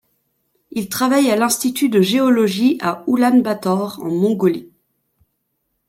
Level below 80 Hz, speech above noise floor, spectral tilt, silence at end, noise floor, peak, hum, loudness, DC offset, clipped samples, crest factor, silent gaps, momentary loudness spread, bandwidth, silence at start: -64 dBFS; 55 dB; -5 dB/octave; 1.25 s; -71 dBFS; -4 dBFS; none; -17 LUFS; under 0.1%; under 0.1%; 14 dB; none; 8 LU; 16.5 kHz; 0.7 s